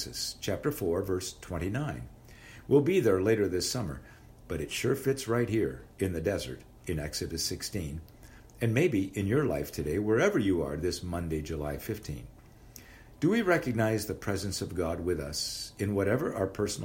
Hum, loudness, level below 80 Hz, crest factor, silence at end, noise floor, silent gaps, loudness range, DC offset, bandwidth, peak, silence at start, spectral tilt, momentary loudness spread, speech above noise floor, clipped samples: none; -31 LUFS; -50 dBFS; 18 dB; 0 s; -52 dBFS; none; 3 LU; under 0.1%; 16 kHz; -12 dBFS; 0 s; -5 dB/octave; 13 LU; 22 dB; under 0.1%